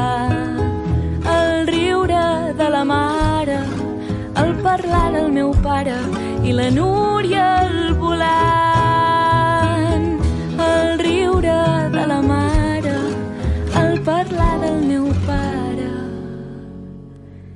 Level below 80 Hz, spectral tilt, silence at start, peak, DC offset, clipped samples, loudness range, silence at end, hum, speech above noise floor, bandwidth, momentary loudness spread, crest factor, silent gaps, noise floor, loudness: -30 dBFS; -6.5 dB/octave; 0 s; -4 dBFS; under 0.1%; under 0.1%; 4 LU; 0 s; none; 21 dB; 11.5 kHz; 8 LU; 14 dB; none; -37 dBFS; -17 LUFS